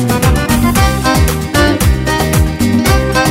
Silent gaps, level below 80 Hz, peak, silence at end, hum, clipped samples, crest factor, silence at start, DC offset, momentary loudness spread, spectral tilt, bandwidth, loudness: none; -18 dBFS; 0 dBFS; 0 s; none; under 0.1%; 10 dB; 0 s; under 0.1%; 2 LU; -5 dB/octave; 16.5 kHz; -12 LUFS